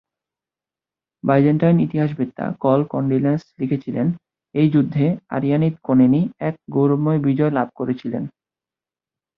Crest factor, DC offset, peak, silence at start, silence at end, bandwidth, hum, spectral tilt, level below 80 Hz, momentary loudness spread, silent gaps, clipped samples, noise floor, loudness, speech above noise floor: 18 dB; under 0.1%; -2 dBFS; 1.25 s; 1.1 s; 5.6 kHz; none; -11 dB/octave; -58 dBFS; 9 LU; none; under 0.1%; under -90 dBFS; -19 LUFS; over 72 dB